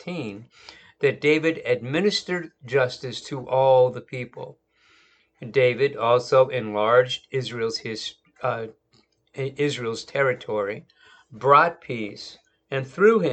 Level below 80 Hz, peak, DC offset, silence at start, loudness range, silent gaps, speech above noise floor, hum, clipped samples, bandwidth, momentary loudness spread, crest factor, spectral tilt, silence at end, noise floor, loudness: -68 dBFS; -2 dBFS; under 0.1%; 0.05 s; 6 LU; none; 41 dB; none; under 0.1%; 8.8 kHz; 16 LU; 22 dB; -5.5 dB/octave; 0 s; -63 dBFS; -23 LUFS